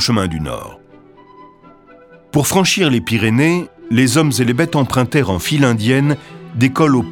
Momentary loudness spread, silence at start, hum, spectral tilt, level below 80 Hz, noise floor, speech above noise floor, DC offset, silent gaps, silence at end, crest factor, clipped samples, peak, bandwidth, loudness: 10 LU; 0 s; none; -5 dB/octave; -44 dBFS; -43 dBFS; 29 dB; under 0.1%; none; 0 s; 16 dB; under 0.1%; 0 dBFS; 19 kHz; -15 LUFS